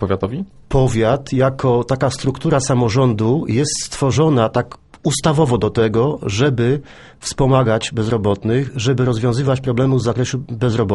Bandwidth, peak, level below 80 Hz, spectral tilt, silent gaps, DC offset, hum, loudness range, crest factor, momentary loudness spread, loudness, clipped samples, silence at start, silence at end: 11.5 kHz; -2 dBFS; -40 dBFS; -6 dB/octave; none; under 0.1%; none; 1 LU; 14 dB; 6 LU; -17 LUFS; under 0.1%; 0 s; 0 s